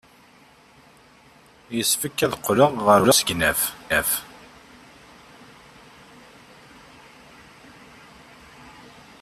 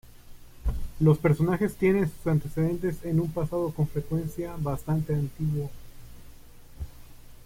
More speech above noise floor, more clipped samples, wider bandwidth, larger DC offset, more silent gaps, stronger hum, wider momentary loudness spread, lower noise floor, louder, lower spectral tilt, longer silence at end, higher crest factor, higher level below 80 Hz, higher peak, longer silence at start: first, 33 dB vs 21 dB; neither; second, 14.5 kHz vs 16.5 kHz; neither; neither; neither; first, 15 LU vs 12 LU; first, -53 dBFS vs -47 dBFS; first, -20 LUFS vs -27 LUFS; second, -3 dB/octave vs -8.5 dB/octave; first, 0.5 s vs 0 s; about the same, 22 dB vs 18 dB; second, -54 dBFS vs -42 dBFS; first, -4 dBFS vs -8 dBFS; first, 1.7 s vs 0.05 s